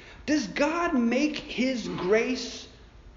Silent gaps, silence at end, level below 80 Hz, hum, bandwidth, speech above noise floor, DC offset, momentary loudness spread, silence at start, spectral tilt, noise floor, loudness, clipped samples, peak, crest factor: none; 0.05 s; -52 dBFS; none; 7.4 kHz; 23 dB; under 0.1%; 10 LU; 0 s; -3.5 dB/octave; -49 dBFS; -27 LUFS; under 0.1%; -12 dBFS; 16 dB